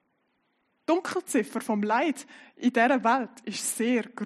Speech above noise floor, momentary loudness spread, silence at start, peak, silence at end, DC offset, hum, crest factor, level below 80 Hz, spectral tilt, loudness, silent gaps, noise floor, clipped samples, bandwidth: 47 dB; 8 LU; 0.9 s; -8 dBFS; 0 s; under 0.1%; none; 18 dB; -82 dBFS; -3.5 dB/octave; -27 LUFS; none; -73 dBFS; under 0.1%; 13 kHz